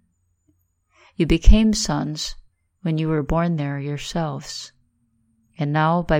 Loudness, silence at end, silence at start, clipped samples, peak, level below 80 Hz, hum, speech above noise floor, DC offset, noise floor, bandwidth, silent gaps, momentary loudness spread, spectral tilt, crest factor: -22 LUFS; 0 s; 1.2 s; under 0.1%; 0 dBFS; -24 dBFS; none; 47 dB; under 0.1%; -66 dBFS; 15.5 kHz; none; 14 LU; -5.5 dB/octave; 20 dB